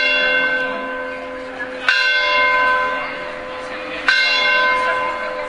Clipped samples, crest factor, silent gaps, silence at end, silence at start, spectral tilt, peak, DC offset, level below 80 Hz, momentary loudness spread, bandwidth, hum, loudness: under 0.1%; 18 dB; none; 0 s; 0 s; -1.5 dB/octave; 0 dBFS; under 0.1%; -50 dBFS; 14 LU; 11 kHz; none; -16 LUFS